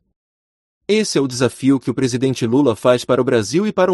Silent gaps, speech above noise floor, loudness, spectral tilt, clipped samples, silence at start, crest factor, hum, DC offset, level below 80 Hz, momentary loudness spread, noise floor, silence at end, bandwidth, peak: none; over 74 dB; -17 LUFS; -5.5 dB/octave; under 0.1%; 0.9 s; 16 dB; none; under 0.1%; -56 dBFS; 4 LU; under -90 dBFS; 0 s; 12 kHz; -2 dBFS